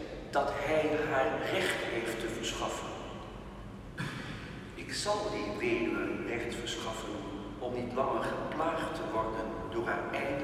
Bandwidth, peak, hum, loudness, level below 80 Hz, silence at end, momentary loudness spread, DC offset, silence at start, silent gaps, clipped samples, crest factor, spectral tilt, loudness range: 15.5 kHz; -16 dBFS; none; -34 LUFS; -52 dBFS; 0 s; 12 LU; under 0.1%; 0 s; none; under 0.1%; 18 dB; -4.5 dB/octave; 5 LU